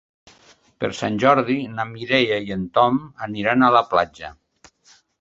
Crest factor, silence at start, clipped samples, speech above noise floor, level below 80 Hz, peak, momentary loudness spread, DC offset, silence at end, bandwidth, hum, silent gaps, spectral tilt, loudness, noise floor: 20 dB; 0.8 s; under 0.1%; 36 dB; -56 dBFS; -2 dBFS; 13 LU; under 0.1%; 0.9 s; 7.8 kHz; none; none; -6 dB/octave; -20 LUFS; -56 dBFS